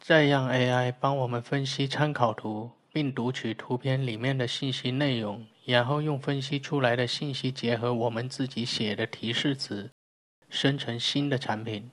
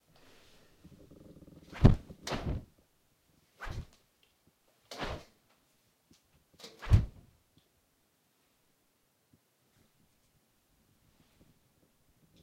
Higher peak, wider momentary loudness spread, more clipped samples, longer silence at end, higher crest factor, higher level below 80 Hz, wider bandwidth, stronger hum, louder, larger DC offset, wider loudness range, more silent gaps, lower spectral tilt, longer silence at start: about the same, -8 dBFS vs -6 dBFS; second, 8 LU vs 29 LU; neither; second, 0 s vs 5.35 s; second, 22 dB vs 32 dB; second, -72 dBFS vs -42 dBFS; second, 11 kHz vs 15 kHz; neither; first, -28 LUFS vs -33 LUFS; neither; second, 2 LU vs 13 LU; first, 9.92-10.42 s vs none; second, -5.5 dB/octave vs -7 dB/octave; second, 0.05 s vs 1.7 s